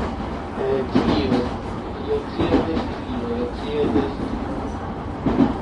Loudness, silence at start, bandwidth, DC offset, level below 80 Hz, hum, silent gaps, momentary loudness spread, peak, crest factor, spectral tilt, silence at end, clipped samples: -23 LUFS; 0 s; 10.5 kHz; under 0.1%; -34 dBFS; none; none; 9 LU; -4 dBFS; 18 dB; -7.5 dB/octave; 0 s; under 0.1%